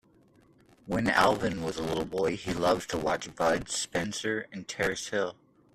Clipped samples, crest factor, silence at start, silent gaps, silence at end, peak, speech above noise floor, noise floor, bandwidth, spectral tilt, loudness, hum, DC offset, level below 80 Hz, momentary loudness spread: under 0.1%; 22 dB; 0.85 s; none; 0.4 s; -8 dBFS; 32 dB; -61 dBFS; 14.5 kHz; -4 dB/octave; -30 LUFS; none; under 0.1%; -56 dBFS; 8 LU